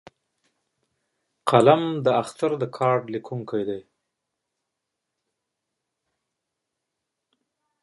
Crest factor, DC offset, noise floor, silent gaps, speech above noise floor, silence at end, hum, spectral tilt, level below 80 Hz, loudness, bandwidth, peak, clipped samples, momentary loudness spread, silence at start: 24 dB; under 0.1%; -83 dBFS; none; 61 dB; 4 s; none; -6.5 dB/octave; -70 dBFS; -23 LUFS; 11.5 kHz; -2 dBFS; under 0.1%; 15 LU; 1.45 s